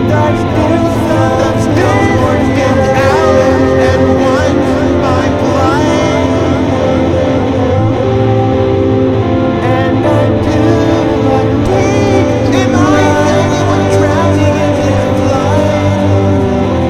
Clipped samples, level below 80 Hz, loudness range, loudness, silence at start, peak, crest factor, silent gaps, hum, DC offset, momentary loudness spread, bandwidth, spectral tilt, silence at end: under 0.1%; -28 dBFS; 1 LU; -10 LUFS; 0 s; 0 dBFS; 10 dB; none; none; under 0.1%; 2 LU; 13 kHz; -7 dB/octave; 0 s